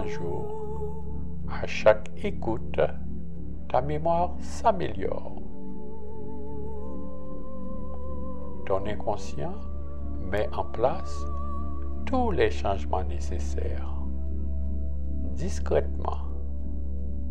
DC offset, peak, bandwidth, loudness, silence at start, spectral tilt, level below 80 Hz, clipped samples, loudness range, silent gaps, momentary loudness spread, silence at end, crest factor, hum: 4%; -6 dBFS; 9 kHz; -31 LUFS; 0 s; -7 dB/octave; -36 dBFS; under 0.1%; 7 LU; none; 13 LU; 0 s; 24 dB; none